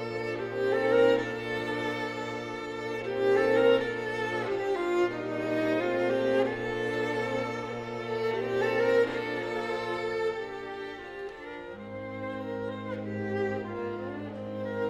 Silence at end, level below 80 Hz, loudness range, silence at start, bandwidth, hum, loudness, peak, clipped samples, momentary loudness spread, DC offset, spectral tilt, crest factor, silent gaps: 0 s; -62 dBFS; 8 LU; 0 s; 13 kHz; none; -30 LUFS; -12 dBFS; under 0.1%; 13 LU; under 0.1%; -6 dB/octave; 16 dB; none